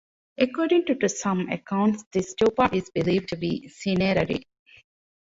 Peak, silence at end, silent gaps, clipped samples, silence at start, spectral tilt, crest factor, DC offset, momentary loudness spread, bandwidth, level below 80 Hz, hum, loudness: -6 dBFS; 0.85 s; 2.06-2.11 s; under 0.1%; 0.4 s; -5.5 dB/octave; 18 dB; under 0.1%; 8 LU; 8 kHz; -54 dBFS; none; -25 LUFS